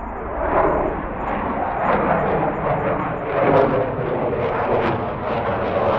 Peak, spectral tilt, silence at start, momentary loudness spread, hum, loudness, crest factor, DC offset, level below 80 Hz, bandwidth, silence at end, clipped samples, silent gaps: -2 dBFS; -9.5 dB/octave; 0 s; 7 LU; none; -21 LUFS; 18 dB; under 0.1%; -36 dBFS; 6 kHz; 0 s; under 0.1%; none